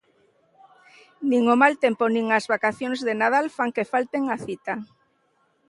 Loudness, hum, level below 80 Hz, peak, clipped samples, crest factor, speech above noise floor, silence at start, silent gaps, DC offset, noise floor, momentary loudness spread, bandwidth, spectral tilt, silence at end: -23 LUFS; none; -72 dBFS; -2 dBFS; under 0.1%; 22 dB; 44 dB; 1.2 s; none; under 0.1%; -67 dBFS; 12 LU; 11.5 kHz; -5 dB/octave; 0.85 s